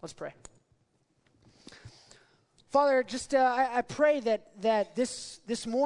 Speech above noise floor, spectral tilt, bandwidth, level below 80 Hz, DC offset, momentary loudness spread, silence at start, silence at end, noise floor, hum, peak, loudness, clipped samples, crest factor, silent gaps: 43 dB; -3.5 dB/octave; 11 kHz; -66 dBFS; under 0.1%; 14 LU; 0.05 s; 0 s; -72 dBFS; none; -12 dBFS; -29 LUFS; under 0.1%; 18 dB; none